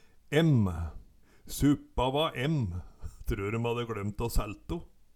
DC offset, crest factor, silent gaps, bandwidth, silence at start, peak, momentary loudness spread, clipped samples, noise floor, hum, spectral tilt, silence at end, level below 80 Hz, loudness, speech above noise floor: under 0.1%; 20 dB; none; 18 kHz; 0.3 s; -10 dBFS; 15 LU; under 0.1%; -53 dBFS; none; -6.5 dB/octave; 0.3 s; -40 dBFS; -31 LUFS; 24 dB